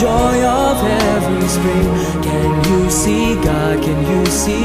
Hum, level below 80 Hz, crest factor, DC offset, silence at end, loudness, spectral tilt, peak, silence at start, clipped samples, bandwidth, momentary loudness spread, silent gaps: none; -26 dBFS; 12 dB; under 0.1%; 0 s; -15 LUFS; -5 dB/octave; 0 dBFS; 0 s; under 0.1%; 15.5 kHz; 3 LU; none